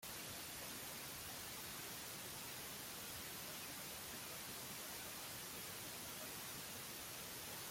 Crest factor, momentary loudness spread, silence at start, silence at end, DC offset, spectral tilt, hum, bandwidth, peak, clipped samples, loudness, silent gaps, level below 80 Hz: 16 dB; 0 LU; 0 s; 0 s; under 0.1%; -1.5 dB/octave; none; 16.5 kHz; -36 dBFS; under 0.1%; -48 LUFS; none; -74 dBFS